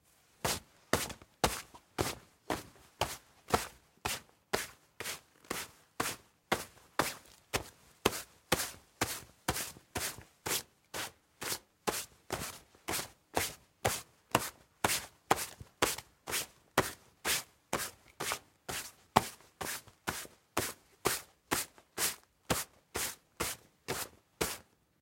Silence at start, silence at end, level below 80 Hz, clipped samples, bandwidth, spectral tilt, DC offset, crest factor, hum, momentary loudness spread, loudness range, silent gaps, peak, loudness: 0.45 s; 0.4 s; -60 dBFS; under 0.1%; 16.5 kHz; -2.5 dB/octave; under 0.1%; 34 dB; none; 9 LU; 4 LU; none; -4 dBFS; -37 LUFS